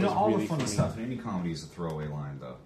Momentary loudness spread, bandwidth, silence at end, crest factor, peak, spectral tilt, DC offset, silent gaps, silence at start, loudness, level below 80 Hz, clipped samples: 10 LU; 14 kHz; 0 s; 16 dB; -14 dBFS; -6 dB/octave; under 0.1%; none; 0 s; -31 LUFS; -52 dBFS; under 0.1%